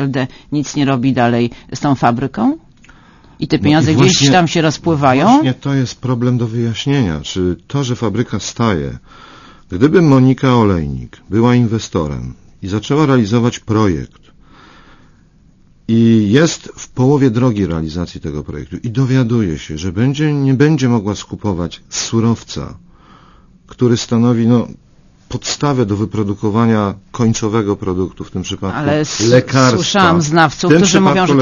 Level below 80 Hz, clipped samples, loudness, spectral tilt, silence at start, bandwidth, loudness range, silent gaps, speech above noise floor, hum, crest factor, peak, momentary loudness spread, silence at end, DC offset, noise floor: -40 dBFS; under 0.1%; -14 LUFS; -5.5 dB/octave; 0 s; 7.4 kHz; 5 LU; none; 34 dB; none; 14 dB; 0 dBFS; 13 LU; 0 s; under 0.1%; -47 dBFS